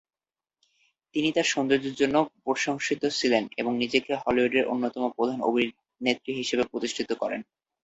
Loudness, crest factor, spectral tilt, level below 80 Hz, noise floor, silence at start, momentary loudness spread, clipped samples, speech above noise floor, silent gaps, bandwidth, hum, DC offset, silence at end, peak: -27 LUFS; 20 dB; -3.5 dB/octave; -64 dBFS; -84 dBFS; 1.15 s; 6 LU; under 0.1%; 58 dB; none; 8.2 kHz; none; under 0.1%; 0.4 s; -8 dBFS